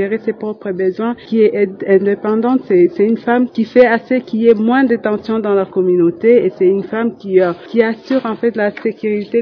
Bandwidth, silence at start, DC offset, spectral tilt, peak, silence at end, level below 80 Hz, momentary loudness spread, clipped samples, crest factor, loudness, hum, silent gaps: 5.4 kHz; 0 s; under 0.1%; -9 dB/octave; 0 dBFS; 0 s; -58 dBFS; 7 LU; 0.1%; 14 dB; -14 LUFS; none; none